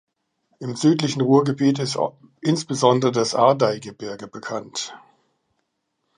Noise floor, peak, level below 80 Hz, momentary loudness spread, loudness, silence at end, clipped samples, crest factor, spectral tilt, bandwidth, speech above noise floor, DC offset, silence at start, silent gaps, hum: -75 dBFS; -2 dBFS; -68 dBFS; 16 LU; -21 LUFS; 1.2 s; under 0.1%; 20 dB; -5.5 dB/octave; 10.5 kHz; 54 dB; under 0.1%; 0.6 s; none; none